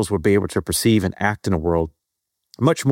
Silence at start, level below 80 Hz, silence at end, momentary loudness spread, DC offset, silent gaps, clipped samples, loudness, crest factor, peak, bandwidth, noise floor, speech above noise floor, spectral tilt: 0 s; -42 dBFS; 0 s; 5 LU; under 0.1%; none; under 0.1%; -20 LUFS; 16 dB; -4 dBFS; 17 kHz; -79 dBFS; 60 dB; -5.5 dB/octave